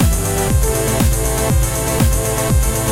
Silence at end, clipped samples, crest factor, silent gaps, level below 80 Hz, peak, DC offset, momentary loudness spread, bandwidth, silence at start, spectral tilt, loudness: 0 s; under 0.1%; 12 dB; none; -20 dBFS; -2 dBFS; under 0.1%; 1 LU; 16.5 kHz; 0 s; -4.5 dB/octave; -16 LUFS